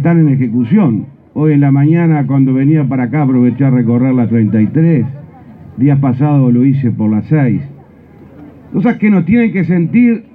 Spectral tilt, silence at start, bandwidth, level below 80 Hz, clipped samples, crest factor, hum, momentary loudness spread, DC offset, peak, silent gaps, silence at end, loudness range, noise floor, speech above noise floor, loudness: -12.5 dB/octave; 0 s; 4 kHz; -50 dBFS; under 0.1%; 10 dB; none; 5 LU; under 0.1%; 0 dBFS; none; 0.15 s; 2 LU; -38 dBFS; 28 dB; -11 LUFS